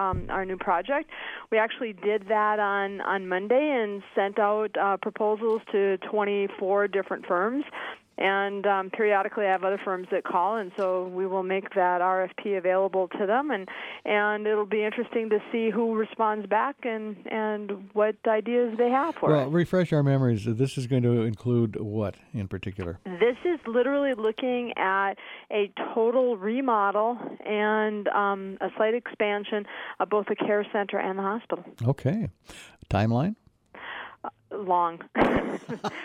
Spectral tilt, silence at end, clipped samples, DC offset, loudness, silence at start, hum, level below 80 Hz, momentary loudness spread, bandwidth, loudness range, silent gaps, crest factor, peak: -7.5 dB/octave; 0 s; under 0.1%; under 0.1%; -27 LUFS; 0 s; none; -56 dBFS; 9 LU; 11 kHz; 3 LU; none; 18 dB; -10 dBFS